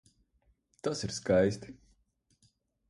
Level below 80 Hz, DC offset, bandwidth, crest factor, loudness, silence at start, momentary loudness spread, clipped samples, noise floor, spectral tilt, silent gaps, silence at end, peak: -58 dBFS; under 0.1%; 11.5 kHz; 22 dB; -31 LUFS; 0.85 s; 16 LU; under 0.1%; -73 dBFS; -5 dB/octave; none; 1.15 s; -14 dBFS